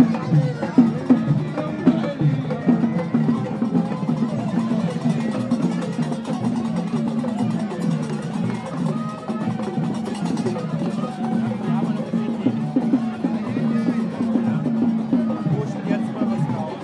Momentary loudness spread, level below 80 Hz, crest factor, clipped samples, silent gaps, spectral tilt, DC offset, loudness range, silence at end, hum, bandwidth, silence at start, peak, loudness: 5 LU; -62 dBFS; 18 dB; under 0.1%; none; -8 dB/octave; under 0.1%; 4 LU; 0 s; none; 11 kHz; 0 s; -2 dBFS; -22 LUFS